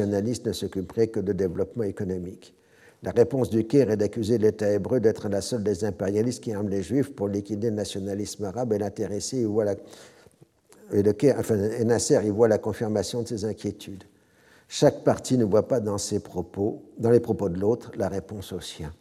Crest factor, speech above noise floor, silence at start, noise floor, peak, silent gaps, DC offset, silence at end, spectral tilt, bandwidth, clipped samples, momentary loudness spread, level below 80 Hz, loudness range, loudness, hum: 20 dB; 33 dB; 0 s; -58 dBFS; -4 dBFS; none; under 0.1%; 0.05 s; -6 dB/octave; 14.5 kHz; under 0.1%; 10 LU; -60 dBFS; 4 LU; -26 LUFS; none